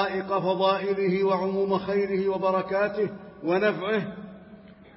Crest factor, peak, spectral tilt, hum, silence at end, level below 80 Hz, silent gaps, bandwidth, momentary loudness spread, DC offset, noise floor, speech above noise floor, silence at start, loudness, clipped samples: 14 dB; -12 dBFS; -10.5 dB/octave; none; 0.25 s; -62 dBFS; none; 5.8 kHz; 7 LU; under 0.1%; -48 dBFS; 23 dB; 0 s; -26 LUFS; under 0.1%